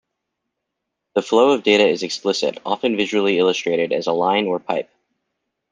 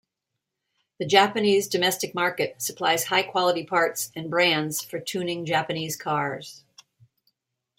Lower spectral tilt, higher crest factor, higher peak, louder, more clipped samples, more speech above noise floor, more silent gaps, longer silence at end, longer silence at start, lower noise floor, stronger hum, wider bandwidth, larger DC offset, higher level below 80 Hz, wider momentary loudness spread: about the same, -4 dB/octave vs -3 dB/octave; second, 18 dB vs 24 dB; about the same, -2 dBFS vs -2 dBFS; first, -19 LUFS vs -24 LUFS; neither; about the same, 61 dB vs 59 dB; neither; second, 0.9 s vs 1.2 s; first, 1.15 s vs 1 s; second, -79 dBFS vs -83 dBFS; neither; second, 9.6 kHz vs 16.5 kHz; neither; about the same, -68 dBFS vs -72 dBFS; about the same, 9 LU vs 10 LU